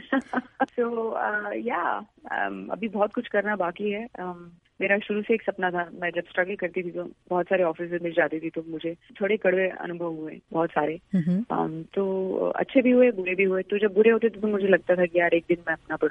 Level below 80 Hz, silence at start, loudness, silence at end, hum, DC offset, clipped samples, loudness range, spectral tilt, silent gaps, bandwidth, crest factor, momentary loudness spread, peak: -66 dBFS; 0 s; -26 LUFS; 0 s; none; under 0.1%; under 0.1%; 6 LU; -8.5 dB/octave; none; 4 kHz; 18 dB; 11 LU; -6 dBFS